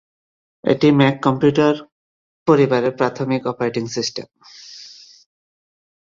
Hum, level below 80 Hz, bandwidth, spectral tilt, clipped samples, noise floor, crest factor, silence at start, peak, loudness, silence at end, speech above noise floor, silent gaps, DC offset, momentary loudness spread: none; -60 dBFS; 7.6 kHz; -6 dB/octave; under 0.1%; -42 dBFS; 18 dB; 0.65 s; -2 dBFS; -18 LUFS; 1.15 s; 25 dB; 1.92-2.46 s; under 0.1%; 22 LU